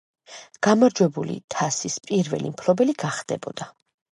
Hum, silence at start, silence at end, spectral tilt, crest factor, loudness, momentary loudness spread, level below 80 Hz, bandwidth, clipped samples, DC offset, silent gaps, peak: none; 0.3 s; 0.45 s; -5 dB/octave; 20 dB; -23 LUFS; 20 LU; -68 dBFS; 11.5 kHz; under 0.1%; under 0.1%; 1.44-1.48 s; -4 dBFS